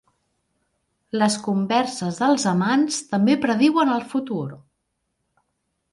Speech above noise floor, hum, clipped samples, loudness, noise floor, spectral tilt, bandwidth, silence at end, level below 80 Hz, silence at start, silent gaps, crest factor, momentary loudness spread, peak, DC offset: 55 dB; none; under 0.1%; -21 LUFS; -75 dBFS; -5 dB/octave; 11.5 kHz; 1.35 s; -66 dBFS; 1.15 s; none; 18 dB; 9 LU; -4 dBFS; under 0.1%